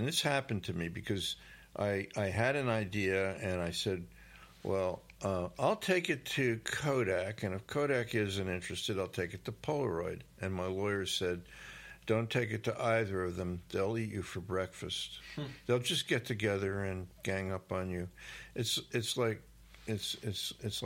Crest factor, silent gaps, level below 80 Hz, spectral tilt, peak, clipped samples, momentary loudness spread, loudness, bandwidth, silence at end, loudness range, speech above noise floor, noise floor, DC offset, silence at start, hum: 20 dB; none; -62 dBFS; -4.5 dB/octave; -16 dBFS; under 0.1%; 10 LU; -35 LUFS; 16.5 kHz; 0 s; 3 LU; 21 dB; -56 dBFS; under 0.1%; 0 s; none